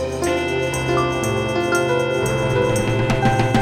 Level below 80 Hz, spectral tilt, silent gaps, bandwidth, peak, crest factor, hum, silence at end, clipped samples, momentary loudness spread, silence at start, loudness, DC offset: -36 dBFS; -5.5 dB/octave; none; 15.5 kHz; -4 dBFS; 14 dB; none; 0 s; under 0.1%; 3 LU; 0 s; -19 LUFS; under 0.1%